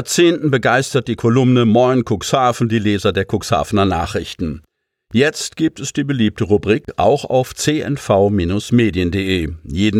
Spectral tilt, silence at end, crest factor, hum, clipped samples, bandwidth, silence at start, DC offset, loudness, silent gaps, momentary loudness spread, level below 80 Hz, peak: -5.5 dB/octave; 0 s; 14 dB; none; under 0.1%; 16 kHz; 0 s; under 0.1%; -16 LUFS; none; 7 LU; -40 dBFS; -2 dBFS